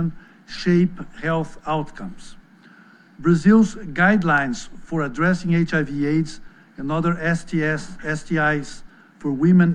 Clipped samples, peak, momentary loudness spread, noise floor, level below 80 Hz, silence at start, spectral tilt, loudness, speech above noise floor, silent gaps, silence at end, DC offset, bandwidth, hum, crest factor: under 0.1%; -4 dBFS; 15 LU; -49 dBFS; -44 dBFS; 0 s; -7 dB/octave; -21 LUFS; 29 dB; none; 0 s; under 0.1%; 9.8 kHz; none; 16 dB